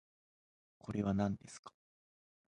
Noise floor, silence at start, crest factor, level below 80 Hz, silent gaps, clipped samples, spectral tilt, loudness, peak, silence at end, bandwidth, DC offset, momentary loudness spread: under -90 dBFS; 0.85 s; 20 dB; -64 dBFS; 1.59-1.63 s; under 0.1%; -7.5 dB/octave; -38 LUFS; -22 dBFS; 0.85 s; 10.5 kHz; under 0.1%; 19 LU